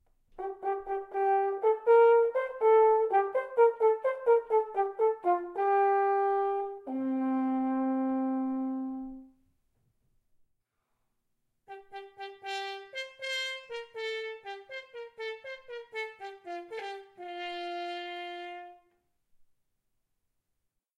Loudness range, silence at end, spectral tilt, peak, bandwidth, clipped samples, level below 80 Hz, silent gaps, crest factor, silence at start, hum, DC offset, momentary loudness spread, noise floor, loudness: 17 LU; 2.25 s; -3.5 dB/octave; -12 dBFS; 9 kHz; under 0.1%; -72 dBFS; none; 18 dB; 0.35 s; none; under 0.1%; 19 LU; -81 dBFS; -29 LUFS